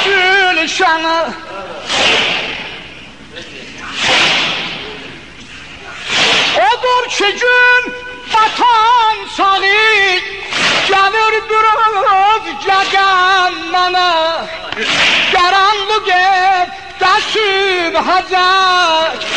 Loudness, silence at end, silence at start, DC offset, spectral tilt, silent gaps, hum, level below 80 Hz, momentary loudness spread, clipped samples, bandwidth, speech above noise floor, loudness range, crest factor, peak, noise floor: -11 LUFS; 0 s; 0 s; 0.8%; -1.5 dB/octave; none; none; -46 dBFS; 17 LU; under 0.1%; 11 kHz; 21 dB; 5 LU; 12 dB; 0 dBFS; -33 dBFS